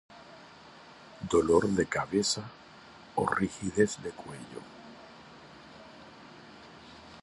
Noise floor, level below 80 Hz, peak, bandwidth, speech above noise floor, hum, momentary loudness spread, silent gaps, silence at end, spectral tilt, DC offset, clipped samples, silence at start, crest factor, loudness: -52 dBFS; -58 dBFS; -10 dBFS; 11.5 kHz; 23 dB; none; 24 LU; none; 0 s; -4.5 dB/octave; under 0.1%; under 0.1%; 0.1 s; 22 dB; -29 LUFS